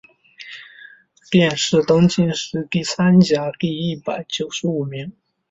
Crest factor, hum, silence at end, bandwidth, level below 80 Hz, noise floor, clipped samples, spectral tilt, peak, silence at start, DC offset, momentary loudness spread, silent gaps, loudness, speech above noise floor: 16 dB; none; 0.4 s; 8 kHz; -54 dBFS; -46 dBFS; under 0.1%; -5.5 dB/octave; -2 dBFS; 0.4 s; under 0.1%; 21 LU; none; -18 LUFS; 28 dB